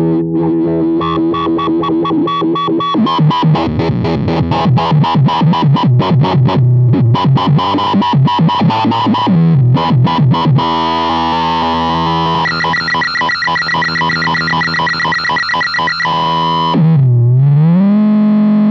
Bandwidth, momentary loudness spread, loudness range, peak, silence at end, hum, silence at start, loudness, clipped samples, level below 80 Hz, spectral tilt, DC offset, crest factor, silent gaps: 7.2 kHz; 4 LU; 2 LU; 0 dBFS; 0 s; none; 0 s; -11 LUFS; under 0.1%; -40 dBFS; -7.5 dB/octave; under 0.1%; 10 dB; none